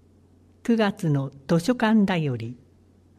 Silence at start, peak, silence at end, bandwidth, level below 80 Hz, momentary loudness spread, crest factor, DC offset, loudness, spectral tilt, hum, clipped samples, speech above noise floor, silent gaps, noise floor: 0.65 s; -8 dBFS; 0.65 s; 14 kHz; -60 dBFS; 13 LU; 16 dB; under 0.1%; -24 LUFS; -7 dB/octave; none; under 0.1%; 34 dB; none; -56 dBFS